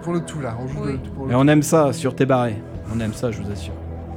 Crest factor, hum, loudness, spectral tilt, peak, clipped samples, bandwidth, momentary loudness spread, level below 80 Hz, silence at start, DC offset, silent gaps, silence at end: 16 dB; none; -21 LUFS; -6.5 dB/octave; -4 dBFS; under 0.1%; 17 kHz; 14 LU; -40 dBFS; 0 s; under 0.1%; none; 0 s